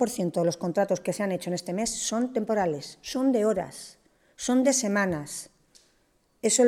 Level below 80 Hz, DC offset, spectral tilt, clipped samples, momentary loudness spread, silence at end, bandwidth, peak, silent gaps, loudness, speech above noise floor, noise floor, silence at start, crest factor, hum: -62 dBFS; under 0.1%; -4 dB/octave; under 0.1%; 13 LU; 0 s; 16 kHz; -10 dBFS; none; -27 LUFS; 41 dB; -67 dBFS; 0 s; 16 dB; none